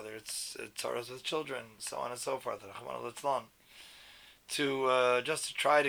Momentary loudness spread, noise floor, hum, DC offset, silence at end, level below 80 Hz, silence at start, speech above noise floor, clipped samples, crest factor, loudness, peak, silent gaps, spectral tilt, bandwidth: 24 LU; -57 dBFS; none; under 0.1%; 0 s; -74 dBFS; 0 s; 23 dB; under 0.1%; 22 dB; -34 LUFS; -12 dBFS; none; -2.5 dB/octave; over 20 kHz